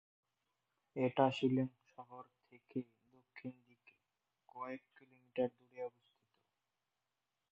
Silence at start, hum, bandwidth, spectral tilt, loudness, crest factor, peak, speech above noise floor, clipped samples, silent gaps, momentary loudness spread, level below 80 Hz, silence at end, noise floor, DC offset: 0.95 s; none; 6.4 kHz; -5.5 dB/octave; -40 LUFS; 26 dB; -18 dBFS; 52 dB; under 0.1%; none; 25 LU; -86 dBFS; 1.65 s; -90 dBFS; under 0.1%